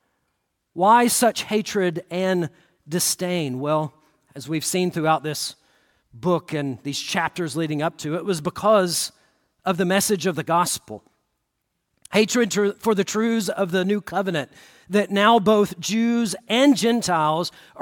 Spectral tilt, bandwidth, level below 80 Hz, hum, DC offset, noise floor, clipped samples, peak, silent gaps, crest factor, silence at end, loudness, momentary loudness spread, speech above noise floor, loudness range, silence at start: -4 dB/octave; 17.5 kHz; -64 dBFS; none; under 0.1%; -76 dBFS; under 0.1%; -4 dBFS; none; 18 dB; 0 s; -22 LUFS; 12 LU; 55 dB; 5 LU; 0.75 s